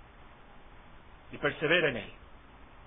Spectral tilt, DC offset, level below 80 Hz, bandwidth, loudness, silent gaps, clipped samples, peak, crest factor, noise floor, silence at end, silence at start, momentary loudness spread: -1 dB/octave; under 0.1%; -58 dBFS; 3.8 kHz; -29 LUFS; none; under 0.1%; -12 dBFS; 22 dB; -53 dBFS; 0.05 s; 0.05 s; 21 LU